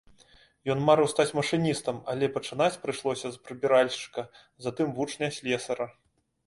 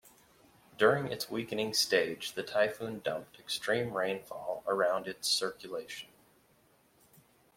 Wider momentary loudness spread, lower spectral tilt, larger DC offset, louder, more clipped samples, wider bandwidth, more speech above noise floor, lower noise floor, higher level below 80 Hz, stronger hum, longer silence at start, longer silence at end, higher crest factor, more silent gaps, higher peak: about the same, 14 LU vs 13 LU; first, -5 dB/octave vs -3 dB/octave; neither; first, -28 LUFS vs -32 LUFS; neither; second, 11.5 kHz vs 16.5 kHz; about the same, 32 dB vs 34 dB; second, -59 dBFS vs -67 dBFS; first, -66 dBFS vs -74 dBFS; neither; first, 0.65 s vs 0.05 s; second, 0.55 s vs 1.5 s; about the same, 20 dB vs 24 dB; neither; first, -8 dBFS vs -12 dBFS